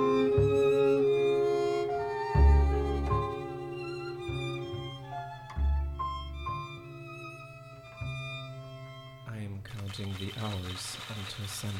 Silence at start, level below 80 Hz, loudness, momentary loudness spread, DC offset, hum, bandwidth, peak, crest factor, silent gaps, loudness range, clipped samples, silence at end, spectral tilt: 0 s; -36 dBFS; -31 LUFS; 19 LU; under 0.1%; none; 14 kHz; -12 dBFS; 18 dB; none; 14 LU; under 0.1%; 0 s; -6.5 dB/octave